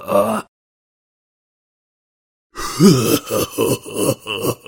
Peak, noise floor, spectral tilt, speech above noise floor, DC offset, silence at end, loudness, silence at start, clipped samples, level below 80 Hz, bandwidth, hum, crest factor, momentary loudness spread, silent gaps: 0 dBFS; under -90 dBFS; -5 dB/octave; over 75 dB; under 0.1%; 0.1 s; -17 LUFS; 0 s; under 0.1%; -48 dBFS; 17 kHz; none; 20 dB; 14 LU; 0.48-2.50 s